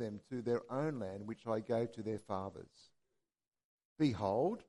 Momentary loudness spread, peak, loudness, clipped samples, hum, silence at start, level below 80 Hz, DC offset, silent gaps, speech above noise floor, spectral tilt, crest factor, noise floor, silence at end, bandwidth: 9 LU; -22 dBFS; -39 LUFS; under 0.1%; none; 0 s; -76 dBFS; under 0.1%; 3.65-3.78 s, 3.85-3.96 s; over 52 dB; -7.5 dB/octave; 18 dB; under -90 dBFS; 0.05 s; 11.5 kHz